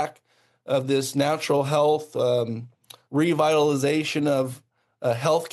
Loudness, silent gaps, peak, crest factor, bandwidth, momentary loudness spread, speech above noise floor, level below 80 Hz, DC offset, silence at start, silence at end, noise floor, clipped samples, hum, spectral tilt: -23 LUFS; none; -8 dBFS; 16 dB; 12.5 kHz; 10 LU; 41 dB; -72 dBFS; under 0.1%; 0 s; 0.05 s; -63 dBFS; under 0.1%; none; -5.5 dB/octave